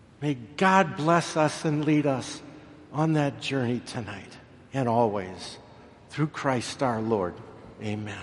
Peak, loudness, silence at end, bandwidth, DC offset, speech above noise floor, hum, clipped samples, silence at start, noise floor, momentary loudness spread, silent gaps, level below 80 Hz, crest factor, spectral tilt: -4 dBFS; -27 LUFS; 0 s; 11.5 kHz; under 0.1%; 23 dB; none; under 0.1%; 0.2 s; -50 dBFS; 17 LU; none; -62 dBFS; 22 dB; -6 dB/octave